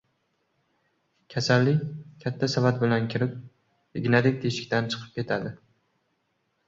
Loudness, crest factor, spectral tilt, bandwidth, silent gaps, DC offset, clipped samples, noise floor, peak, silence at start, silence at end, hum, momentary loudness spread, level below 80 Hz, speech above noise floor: -26 LUFS; 22 dB; -6 dB/octave; 7.8 kHz; none; under 0.1%; under 0.1%; -74 dBFS; -6 dBFS; 1.3 s; 1.1 s; none; 13 LU; -62 dBFS; 49 dB